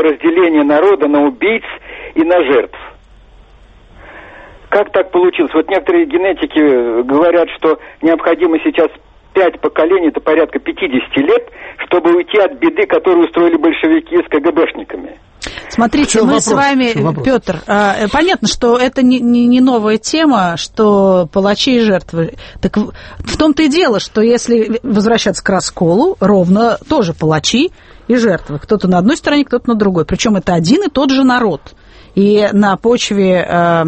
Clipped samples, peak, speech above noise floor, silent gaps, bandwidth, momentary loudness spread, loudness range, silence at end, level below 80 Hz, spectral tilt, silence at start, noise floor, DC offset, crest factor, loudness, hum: under 0.1%; 0 dBFS; 30 dB; none; 8.8 kHz; 7 LU; 3 LU; 0 s; -40 dBFS; -5 dB/octave; 0 s; -41 dBFS; under 0.1%; 12 dB; -12 LUFS; none